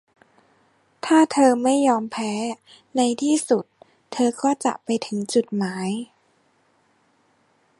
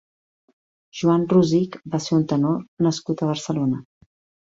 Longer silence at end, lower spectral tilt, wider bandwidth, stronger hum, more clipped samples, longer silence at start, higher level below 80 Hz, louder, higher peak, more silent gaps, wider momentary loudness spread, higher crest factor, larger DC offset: first, 1.75 s vs 0.6 s; second, -4.5 dB/octave vs -7 dB/octave; first, 11.5 kHz vs 7.8 kHz; neither; neither; about the same, 1.05 s vs 0.95 s; second, -72 dBFS vs -60 dBFS; about the same, -22 LUFS vs -22 LUFS; about the same, -4 dBFS vs -4 dBFS; second, none vs 2.68-2.77 s; first, 14 LU vs 9 LU; about the same, 18 dB vs 18 dB; neither